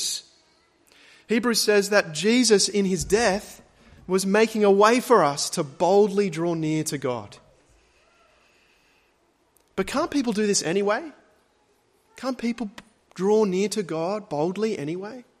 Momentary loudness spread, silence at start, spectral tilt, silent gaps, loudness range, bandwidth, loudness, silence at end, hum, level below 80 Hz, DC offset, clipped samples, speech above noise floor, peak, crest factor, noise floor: 14 LU; 0 s; -4 dB/octave; none; 10 LU; 15 kHz; -23 LUFS; 0.2 s; none; -56 dBFS; under 0.1%; under 0.1%; 43 dB; -4 dBFS; 20 dB; -65 dBFS